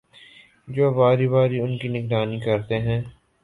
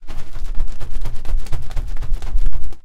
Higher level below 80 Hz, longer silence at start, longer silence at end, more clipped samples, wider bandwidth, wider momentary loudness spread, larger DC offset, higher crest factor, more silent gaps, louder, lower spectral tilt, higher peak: second, -52 dBFS vs -20 dBFS; first, 0.65 s vs 0.05 s; first, 0.3 s vs 0.05 s; neither; about the same, 4.3 kHz vs 4.1 kHz; first, 10 LU vs 6 LU; neither; first, 18 dB vs 8 dB; neither; first, -22 LUFS vs -30 LUFS; first, -9 dB/octave vs -5.5 dB/octave; second, -6 dBFS vs -2 dBFS